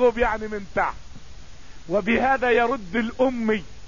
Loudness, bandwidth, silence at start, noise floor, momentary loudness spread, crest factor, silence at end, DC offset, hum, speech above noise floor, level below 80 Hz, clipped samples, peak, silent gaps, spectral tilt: -23 LUFS; 7.4 kHz; 0 s; -43 dBFS; 8 LU; 16 dB; 0 s; 1%; none; 21 dB; -42 dBFS; under 0.1%; -8 dBFS; none; -6 dB/octave